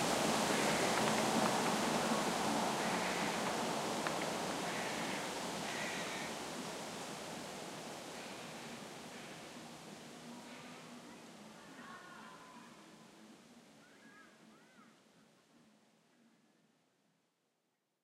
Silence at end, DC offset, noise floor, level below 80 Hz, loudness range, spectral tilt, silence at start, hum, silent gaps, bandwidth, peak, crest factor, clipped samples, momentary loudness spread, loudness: 3.15 s; under 0.1%; -84 dBFS; -72 dBFS; 21 LU; -3 dB/octave; 0 s; none; none; 16 kHz; -20 dBFS; 22 dB; under 0.1%; 21 LU; -38 LUFS